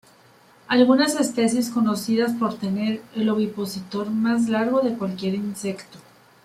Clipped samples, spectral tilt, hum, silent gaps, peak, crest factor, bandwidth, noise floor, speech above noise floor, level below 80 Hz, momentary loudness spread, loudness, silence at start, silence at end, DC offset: under 0.1%; -5 dB/octave; none; none; -4 dBFS; 18 dB; 15 kHz; -53 dBFS; 31 dB; -66 dBFS; 10 LU; -22 LUFS; 0.7 s; 0.45 s; under 0.1%